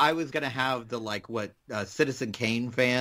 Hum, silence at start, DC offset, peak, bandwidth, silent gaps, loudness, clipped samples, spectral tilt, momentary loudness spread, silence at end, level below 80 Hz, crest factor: none; 0 s; under 0.1%; -8 dBFS; 16 kHz; none; -30 LUFS; under 0.1%; -4.5 dB/octave; 10 LU; 0 s; -66 dBFS; 20 dB